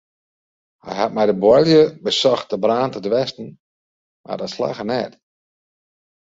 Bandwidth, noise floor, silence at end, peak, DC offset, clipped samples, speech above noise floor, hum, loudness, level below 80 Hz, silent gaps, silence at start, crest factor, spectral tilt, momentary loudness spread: 7.8 kHz; under -90 dBFS; 1.25 s; -2 dBFS; under 0.1%; under 0.1%; over 72 dB; none; -18 LUFS; -58 dBFS; 3.60-4.24 s; 0.85 s; 18 dB; -5.5 dB/octave; 17 LU